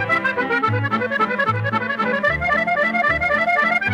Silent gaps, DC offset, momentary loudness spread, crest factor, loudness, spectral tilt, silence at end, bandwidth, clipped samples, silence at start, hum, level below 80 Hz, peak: none; under 0.1%; 4 LU; 12 dB; -18 LUFS; -6.5 dB/octave; 0 s; 13 kHz; under 0.1%; 0 s; none; -44 dBFS; -6 dBFS